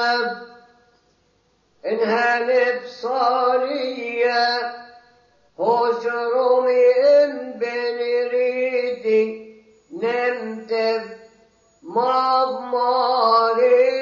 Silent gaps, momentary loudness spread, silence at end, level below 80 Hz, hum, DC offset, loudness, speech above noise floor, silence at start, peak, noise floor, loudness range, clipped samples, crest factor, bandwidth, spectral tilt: none; 11 LU; 0 s; -72 dBFS; none; under 0.1%; -20 LUFS; 44 dB; 0 s; -6 dBFS; -63 dBFS; 4 LU; under 0.1%; 14 dB; 7.2 kHz; -4.5 dB/octave